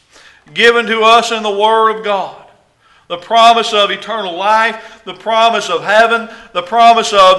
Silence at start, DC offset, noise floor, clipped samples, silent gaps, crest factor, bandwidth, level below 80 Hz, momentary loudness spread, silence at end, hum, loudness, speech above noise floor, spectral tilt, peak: 0.55 s; under 0.1%; -50 dBFS; 0.4%; none; 12 dB; 12 kHz; -52 dBFS; 15 LU; 0 s; none; -11 LUFS; 39 dB; -2 dB/octave; 0 dBFS